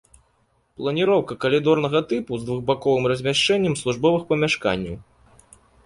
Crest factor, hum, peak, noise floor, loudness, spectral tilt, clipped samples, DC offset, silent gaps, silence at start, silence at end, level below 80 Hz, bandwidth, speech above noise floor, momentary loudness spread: 18 dB; none; -4 dBFS; -65 dBFS; -21 LUFS; -5 dB/octave; under 0.1%; under 0.1%; none; 0.8 s; 0.85 s; -52 dBFS; 11.5 kHz; 44 dB; 8 LU